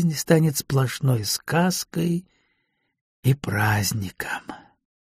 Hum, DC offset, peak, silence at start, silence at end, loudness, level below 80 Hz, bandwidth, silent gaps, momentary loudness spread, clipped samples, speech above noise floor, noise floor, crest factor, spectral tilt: none; under 0.1%; -2 dBFS; 0 s; 0.6 s; -23 LUFS; -54 dBFS; 15.5 kHz; 3.01-3.23 s; 10 LU; under 0.1%; 50 dB; -73 dBFS; 22 dB; -5 dB/octave